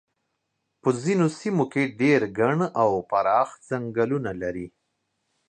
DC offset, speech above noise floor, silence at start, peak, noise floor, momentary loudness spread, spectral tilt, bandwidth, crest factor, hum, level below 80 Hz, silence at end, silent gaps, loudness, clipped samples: under 0.1%; 54 dB; 0.85 s; -6 dBFS; -77 dBFS; 10 LU; -7 dB/octave; 9.6 kHz; 18 dB; none; -60 dBFS; 0.8 s; none; -24 LUFS; under 0.1%